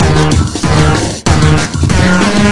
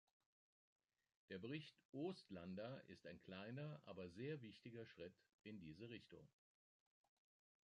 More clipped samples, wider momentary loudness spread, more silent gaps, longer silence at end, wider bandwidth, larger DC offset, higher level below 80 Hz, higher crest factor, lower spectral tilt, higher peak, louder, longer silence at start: first, 0.2% vs under 0.1%; second, 3 LU vs 9 LU; second, none vs 1.85-1.93 s, 5.34-5.39 s; second, 0 s vs 1.35 s; first, 11.5 kHz vs 10 kHz; first, 6% vs under 0.1%; first, -22 dBFS vs -82 dBFS; second, 10 dB vs 20 dB; second, -5 dB/octave vs -7 dB/octave; first, 0 dBFS vs -38 dBFS; first, -10 LUFS vs -56 LUFS; second, 0 s vs 1.3 s